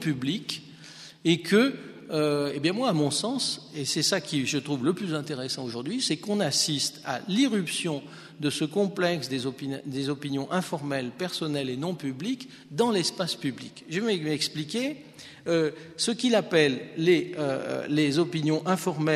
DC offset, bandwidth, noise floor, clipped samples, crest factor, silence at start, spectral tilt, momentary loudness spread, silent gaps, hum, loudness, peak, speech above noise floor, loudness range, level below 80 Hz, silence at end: under 0.1%; 13.5 kHz; -47 dBFS; under 0.1%; 20 dB; 0 s; -4.5 dB/octave; 10 LU; none; none; -27 LUFS; -6 dBFS; 20 dB; 4 LU; -72 dBFS; 0 s